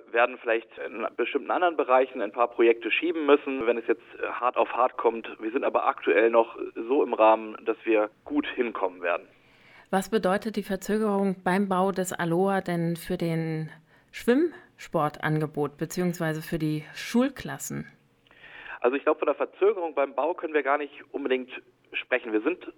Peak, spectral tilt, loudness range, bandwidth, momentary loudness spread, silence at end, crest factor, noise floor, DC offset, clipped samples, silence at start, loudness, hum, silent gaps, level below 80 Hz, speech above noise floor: -8 dBFS; -6 dB/octave; 4 LU; 19 kHz; 11 LU; 0.05 s; 20 dB; -56 dBFS; under 0.1%; under 0.1%; 0.15 s; -27 LUFS; none; none; -62 dBFS; 30 dB